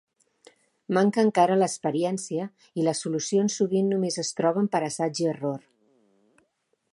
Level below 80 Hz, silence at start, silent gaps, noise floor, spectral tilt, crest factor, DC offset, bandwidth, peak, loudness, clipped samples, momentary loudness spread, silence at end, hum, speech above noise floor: -78 dBFS; 0.9 s; none; -73 dBFS; -5 dB/octave; 20 dB; under 0.1%; 11.5 kHz; -6 dBFS; -25 LUFS; under 0.1%; 10 LU; 1.35 s; none; 48 dB